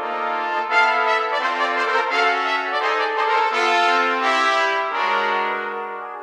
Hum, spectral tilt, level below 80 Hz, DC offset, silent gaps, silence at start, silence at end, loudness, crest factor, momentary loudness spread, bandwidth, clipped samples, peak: none; -1 dB/octave; -74 dBFS; under 0.1%; none; 0 s; 0 s; -19 LUFS; 16 dB; 6 LU; 12.5 kHz; under 0.1%; -4 dBFS